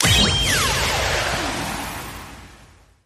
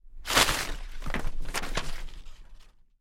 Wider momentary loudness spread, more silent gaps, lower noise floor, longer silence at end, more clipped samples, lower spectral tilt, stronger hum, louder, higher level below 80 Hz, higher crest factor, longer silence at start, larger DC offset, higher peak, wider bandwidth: about the same, 18 LU vs 19 LU; neither; about the same, -49 dBFS vs -50 dBFS; about the same, 0.4 s vs 0.3 s; neither; about the same, -2.5 dB/octave vs -1.5 dB/octave; neither; first, -19 LUFS vs -28 LUFS; about the same, -34 dBFS vs -34 dBFS; second, 18 dB vs 24 dB; about the same, 0 s vs 0.05 s; neither; about the same, -4 dBFS vs -6 dBFS; about the same, 15.5 kHz vs 16.5 kHz